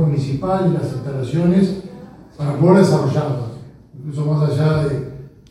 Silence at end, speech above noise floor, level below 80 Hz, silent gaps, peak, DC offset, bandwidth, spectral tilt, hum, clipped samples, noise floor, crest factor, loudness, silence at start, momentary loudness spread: 0.2 s; 22 dB; -46 dBFS; none; 0 dBFS; under 0.1%; 11 kHz; -8.5 dB/octave; none; under 0.1%; -38 dBFS; 18 dB; -18 LUFS; 0 s; 20 LU